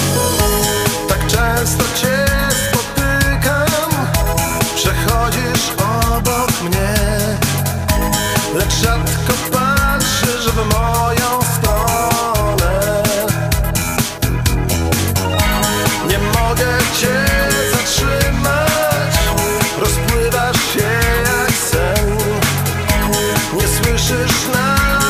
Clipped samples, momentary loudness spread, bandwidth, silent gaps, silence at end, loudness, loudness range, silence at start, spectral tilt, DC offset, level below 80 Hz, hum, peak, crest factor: under 0.1%; 2 LU; 16 kHz; none; 0 s; -15 LUFS; 1 LU; 0 s; -4 dB/octave; under 0.1%; -24 dBFS; none; 0 dBFS; 14 dB